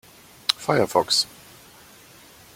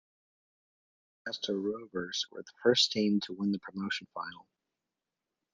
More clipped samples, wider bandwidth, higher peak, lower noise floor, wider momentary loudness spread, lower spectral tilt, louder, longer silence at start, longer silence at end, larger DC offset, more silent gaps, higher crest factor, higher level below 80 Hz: neither; first, 16.5 kHz vs 9.6 kHz; first, 0 dBFS vs -12 dBFS; second, -49 dBFS vs -89 dBFS; second, 8 LU vs 16 LU; about the same, -3 dB/octave vs -4 dB/octave; first, -22 LUFS vs -32 LUFS; second, 0.5 s vs 1.25 s; first, 1.3 s vs 1.15 s; neither; neither; about the same, 26 dB vs 22 dB; first, -62 dBFS vs -78 dBFS